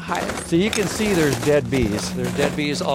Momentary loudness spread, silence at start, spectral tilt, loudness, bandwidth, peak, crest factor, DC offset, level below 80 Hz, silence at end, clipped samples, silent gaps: 5 LU; 0 s; -5 dB/octave; -21 LUFS; 16.5 kHz; -6 dBFS; 14 dB; under 0.1%; -40 dBFS; 0 s; under 0.1%; none